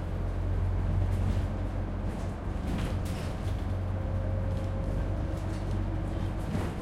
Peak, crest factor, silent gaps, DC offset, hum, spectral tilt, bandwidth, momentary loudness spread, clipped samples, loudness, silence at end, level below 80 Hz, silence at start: -18 dBFS; 14 dB; none; under 0.1%; none; -7.5 dB/octave; 12 kHz; 4 LU; under 0.1%; -33 LUFS; 0 s; -34 dBFS; 0 s